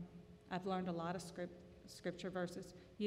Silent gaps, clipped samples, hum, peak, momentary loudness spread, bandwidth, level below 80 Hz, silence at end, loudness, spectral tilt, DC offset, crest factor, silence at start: none; under 0.1%; none; -28 dBFS; 15 LU; 15 kHz; -72 dBFS; 0 s; -46 LUFS; -6 dB/octave; under 0.1%; 16 dB; 0 s